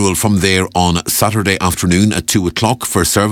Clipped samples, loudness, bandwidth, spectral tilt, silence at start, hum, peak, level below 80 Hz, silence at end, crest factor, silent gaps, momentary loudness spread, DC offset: under 0.1%; -13 LUFS; 19 kHz; -4 dB/octave; 0 s; none; 0 dBFS; -34 dBFS; 0 s; 14 dB; none; 2 LU; under 0.1%